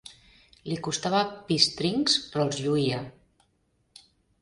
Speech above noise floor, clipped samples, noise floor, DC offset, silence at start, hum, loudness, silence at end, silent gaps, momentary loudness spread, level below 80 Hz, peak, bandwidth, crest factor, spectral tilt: 44 dB; under 0.1%; -71 dBFS; under 0.1%; 0.05 s; none; -26 LUFS; 1.3 s; none; 12 LU; -62 dBFS; -4 dBFS; 11.5 kHz; 26 dB; -4 dB/octave